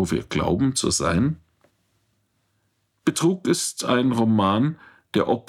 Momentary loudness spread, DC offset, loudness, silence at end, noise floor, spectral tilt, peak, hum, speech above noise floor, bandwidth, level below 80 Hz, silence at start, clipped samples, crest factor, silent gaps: 7 LU; under 0.1%; -22 LUFS; 0.1 s; -70 dBFS; -5 dB/octave; -6 dBFS; none; 49 dB; 16 kHz; -48 dBFS; 0 s; under 0.1%; 16 dB; none